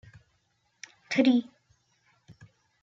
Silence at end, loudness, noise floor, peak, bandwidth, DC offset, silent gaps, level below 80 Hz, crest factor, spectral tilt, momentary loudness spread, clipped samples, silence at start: 1.4 s; -26 LUFS; -73 dBFS; -12 dBFS; 7.6 kHz; under 0.1%; none; -74 dBFS; 20 dB; -5 dB/octave; 26 LU; under 0.1%; 1.1 s